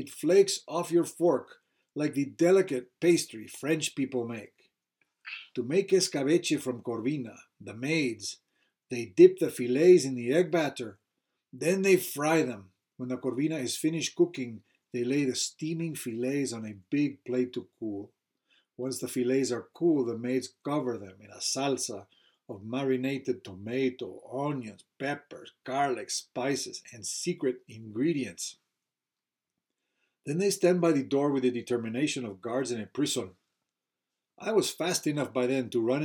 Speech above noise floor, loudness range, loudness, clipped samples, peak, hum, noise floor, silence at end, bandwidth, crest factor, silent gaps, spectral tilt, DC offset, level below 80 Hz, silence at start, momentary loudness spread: over 61 dB; 8 LU; -29 LUFS; under 0.1%; -6 dBFS; none; under -90 dBFS; 0 s; 17.5 kHz; 22 dB; none; -4.5 dB/octave; under 0.1%; -84 dBFS; 0 s; 15 LU